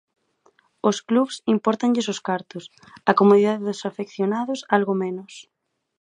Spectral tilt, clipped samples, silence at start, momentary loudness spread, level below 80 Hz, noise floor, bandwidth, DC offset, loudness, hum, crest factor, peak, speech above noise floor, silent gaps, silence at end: -5.5 dB/octave; under 0.1%; 0.85 s; 13 LU; -72 dBFS; -62 dBFS; 10.5 kHz; under 0.1%; -22 LUFS; none; 22 dB; 0 dBFS; 40 dB; none; 0.6 s